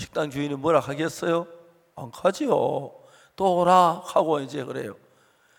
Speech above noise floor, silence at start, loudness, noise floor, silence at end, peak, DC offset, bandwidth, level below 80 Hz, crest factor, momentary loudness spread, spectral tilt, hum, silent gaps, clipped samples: 37 dB; 0 s; -24 LUFS; -60 dBFS; 0.65 s; -4 dBFS; under 0.1%; 17 kHz; -64 dBFS; 20 dB; 18 LU; -5.5 dB/octave; none; none; under 0.1%